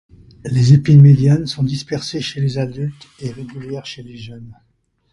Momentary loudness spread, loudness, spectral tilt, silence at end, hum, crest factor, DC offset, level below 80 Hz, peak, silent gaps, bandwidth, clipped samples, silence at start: 24 LU; -14 LUFS; -7.5 dB/octave; 0.6 s; none; 16 dB; under 0.1%; -46 dBFS; 0 dBFS; none; 10.5 kHz; under 0.1%; 0.45 s